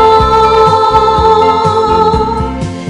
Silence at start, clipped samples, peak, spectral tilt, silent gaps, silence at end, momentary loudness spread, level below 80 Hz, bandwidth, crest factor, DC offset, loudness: 0 s; 0.3%; 0 dBFS; -6 dB/octave; none; 0 s; 7 LU; -24 dBFS; 11 kHz; 8 dB; under 0.1%; -8 LUFS